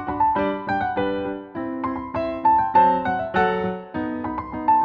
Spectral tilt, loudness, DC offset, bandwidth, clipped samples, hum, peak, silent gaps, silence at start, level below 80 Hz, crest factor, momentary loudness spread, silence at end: -8.5 dB/octave; -22 LUFS; under 0.1%; 5.2 kHz; under 0.1%; none; -6 dBFS; none; 0 s; -48 dBFS; 16 dB; 11 LU; 0 s